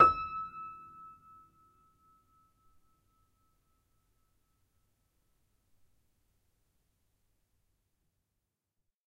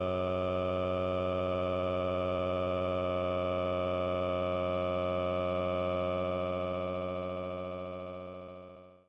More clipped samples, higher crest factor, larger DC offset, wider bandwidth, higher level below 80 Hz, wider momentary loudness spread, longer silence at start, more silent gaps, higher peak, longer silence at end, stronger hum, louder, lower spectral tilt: neither; first, 30 dB vs 12 dB; neither; first, 10 kHz vs 6 kHz; about the same, -66 dBFS vs -66 dBFS; first, 22 LU vs 8 LU; about the same, 0 s vs 0 s; neither; first, -10 dBFS vs -22 dBFS; first, 8.05 s vs 0.1 s; neither; about the same, -33 LUFS vs -33 LUFS; second, -6 dB/octave vs -8.5 dB/octave